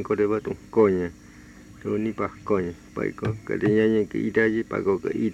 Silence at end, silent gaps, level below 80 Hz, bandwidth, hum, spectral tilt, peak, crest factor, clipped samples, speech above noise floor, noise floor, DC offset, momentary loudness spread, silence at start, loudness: 0 s; none; -54 dBFS; 8.8 kHz; none; -8 dB/octave; -8 dBFS; 18 dB; under 0.1%; 22 dB; -46 dBFS; under 0.1%; 10 LU; 0 s; -25 LUFS